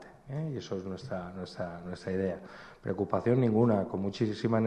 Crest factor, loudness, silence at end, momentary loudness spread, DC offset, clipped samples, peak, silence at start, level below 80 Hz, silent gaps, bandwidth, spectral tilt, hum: 18 dB; -32 LUFS; 0 s; 14 LU; under 0.1%; under 0.1%; -14 dBFS; 0 s; -64 dBFS; none; 9.6 kHz; -8 dB/octave; none